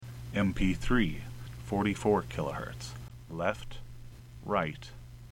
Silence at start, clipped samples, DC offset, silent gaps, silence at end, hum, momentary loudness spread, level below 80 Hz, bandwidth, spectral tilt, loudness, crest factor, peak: 0 s; under 0.1%; under 0.1%; none; 0 s; none; 19 LU; -42 dBFS; 16.5 kHz; -6.5 dB/octave; -32 LUFS; 20 dB; -12 dBFS